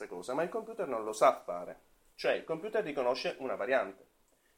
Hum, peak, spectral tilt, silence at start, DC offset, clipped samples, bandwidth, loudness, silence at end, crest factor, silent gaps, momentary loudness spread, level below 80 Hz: none; -12 dBFS; -4 dB/octave; 0 s; under 0.1%; under 0.1%; 16.5 kHz; -34 LUFS; 0.65 s; 22 dB; none; 12 LU; -72 dBFS